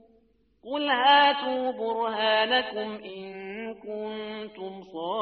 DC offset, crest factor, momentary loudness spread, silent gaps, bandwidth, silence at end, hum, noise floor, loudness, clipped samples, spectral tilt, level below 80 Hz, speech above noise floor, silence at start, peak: under 0.1%; 20 dB; 19 LU; none; 5.6 kHz; 0 s; none; -65 dBFS; -25 LUFS; under 0.1%; 0.5 dB/octave; -72 dBFS; 38 dB; 0.65 s; -8 dBFS